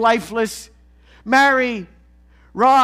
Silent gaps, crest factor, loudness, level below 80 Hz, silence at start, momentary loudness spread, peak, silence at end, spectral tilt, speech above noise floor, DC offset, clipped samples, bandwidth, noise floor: none; 16 dB; -17 LUFS; -50 dBFS; 0 s; 21 LU; -2 dBFS; 0 s; -3.5 dB/octave; 34 dB; under 0.1%; under 0.1%; 16 kHz; -50 dBFS